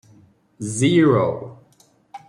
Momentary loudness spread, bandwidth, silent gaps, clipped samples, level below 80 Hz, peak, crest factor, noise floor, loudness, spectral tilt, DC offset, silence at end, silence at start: 18 LU; 11.5 kHz; none; under 0.1%; -60 dBFS; -4 dBFS; 16 dB; -57 dBFS; -18 LUFS; -6 dB/octave; under 0.1%; 0.1 s; 0.6 s